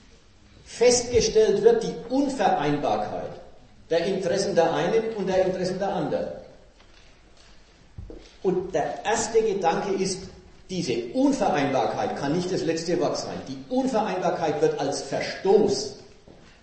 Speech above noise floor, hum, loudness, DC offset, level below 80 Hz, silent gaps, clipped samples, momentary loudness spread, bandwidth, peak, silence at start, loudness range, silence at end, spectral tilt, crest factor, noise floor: 29 dB; none; -24 LUFS; under 0.1%; -50 dBFS; none; under 0.1%; 14 LU; 8.8 kHz; -4 dBFS; 0.65 s; 7 LU; 0.6 s; -4.5 dB/octave; 20 dB; -53 dBFS